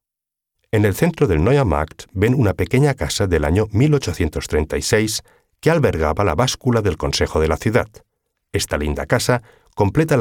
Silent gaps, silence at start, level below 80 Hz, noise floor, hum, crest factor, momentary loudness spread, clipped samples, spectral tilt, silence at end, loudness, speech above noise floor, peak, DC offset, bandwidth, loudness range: none; 0.75 s; -32 dBFS; -85 dBFS; none; 16 dB; 6 LU; under 0.1%; -5.5 dB/octave; 0 s; -18 LUFS; 67 dB; -2 dBFS; under 0.1%; 18 kHz; 2 LU